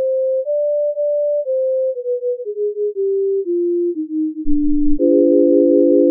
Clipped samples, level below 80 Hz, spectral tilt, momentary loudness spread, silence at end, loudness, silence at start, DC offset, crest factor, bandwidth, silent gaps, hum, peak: under 0.1%; -32 dBFS; -7.5 dB/octave; 9 LU; 0 s; -17 LUFS; 0 s; under 0.1%; 14 dB; 0.7 kHz; none; none; -2 dBFS